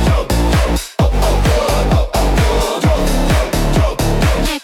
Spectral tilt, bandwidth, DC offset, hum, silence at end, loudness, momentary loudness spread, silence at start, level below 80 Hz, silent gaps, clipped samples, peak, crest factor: -5.5 dB/octave; 17 kHz; under 0.1%; none; 0 s; -15 LUFS; 1 LU; 0 s; -16 dBFS; none; under 0.1%; -2 dBFS; 10 dB